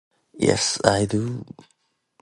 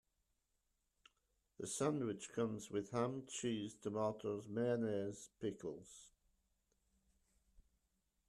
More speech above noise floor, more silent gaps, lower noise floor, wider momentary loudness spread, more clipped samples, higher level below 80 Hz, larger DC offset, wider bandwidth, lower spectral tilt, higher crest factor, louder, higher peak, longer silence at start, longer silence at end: about the same, 43 dB vs 43 dB; neither; second, -65 dBFS vs -85 dBFS; first, 14 LU vs 11 LU; neither; first, -50 dBFS vs -78 dBFS; neither; second, 11.5 kHz vs 13.5 kHz; second, -4 dB/octave vs -5.5 dB/octave; first, 24 dB vs 18 dB; first, -22 LUFS vs -43 LUFS; first, 0 dBFS vs -28 dBFS; second, 0.35 s vs 1.6 s; second, 0.8 s vs 2.2 s